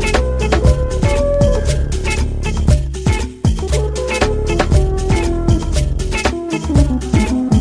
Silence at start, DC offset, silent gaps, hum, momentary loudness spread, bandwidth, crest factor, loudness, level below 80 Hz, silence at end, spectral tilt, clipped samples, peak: 0 s; under 0.1%; none; none; 4 LU; 11 kHz; 14 dB; -16 LUFS; -18 dBFS; 0 s; -6 dB/octave; under 0.1%; 0 dBFS